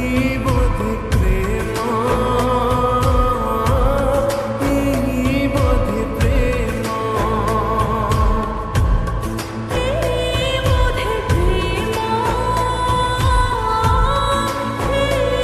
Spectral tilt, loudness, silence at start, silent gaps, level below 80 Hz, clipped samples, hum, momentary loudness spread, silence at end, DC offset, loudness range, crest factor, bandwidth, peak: -6 dB/octave; -18 LUFS; 0 s; none; -22 dBFS; under 0.1%; none; 4 LU; 0 s; 0.1%; 2 LU; 14 dB; 14 kHz; -4 dBFS